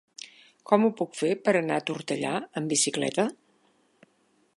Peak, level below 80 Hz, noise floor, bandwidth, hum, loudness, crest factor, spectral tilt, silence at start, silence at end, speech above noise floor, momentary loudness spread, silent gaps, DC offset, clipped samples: -6 dBFS; -78 dBFS; -67 dBFS; 11.5 kHz; none; -27 LUFS; 24 dB; -3.5 dB/octave; 0.25 s; 1.25 s; 41 dB; 8 LU; none; under 0.1%; under 0.1%